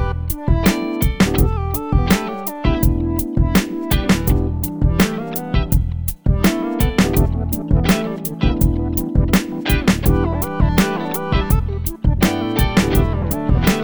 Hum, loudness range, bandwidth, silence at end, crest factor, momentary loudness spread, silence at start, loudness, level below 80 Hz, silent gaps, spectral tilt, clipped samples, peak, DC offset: none; 1 LU; over 20 kHz; 0 s; 14 dB; 5 LU; 0 s; -18 LUFS; -22 dBFS; none; -6 dB/octave; under 0.1%; -2 dBFS; 0.6%